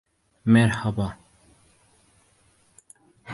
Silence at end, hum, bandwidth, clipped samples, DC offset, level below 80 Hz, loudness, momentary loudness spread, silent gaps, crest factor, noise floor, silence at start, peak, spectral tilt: 0 s; none; 11.5 kHz; under 0.1%; under 0.1%; -52 dBFS; -22 LUFS; 12 LU; none; 20 dB; -62 dBFS; 0.45 s; -6 dBFS; -7 dB/octave